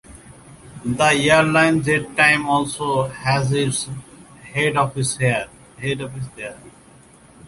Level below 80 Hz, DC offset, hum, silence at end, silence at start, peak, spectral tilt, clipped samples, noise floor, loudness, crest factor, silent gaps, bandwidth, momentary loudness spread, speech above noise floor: -50 dBFS; under 0.1%; none; 0 s; 0.1 s; -2 dBFS; -4.5 dB/octave; under 0.1%; -48 dBFS; -18 LUFS; 20 dB; none; 11.5 kHz; 16 LU; 29 dB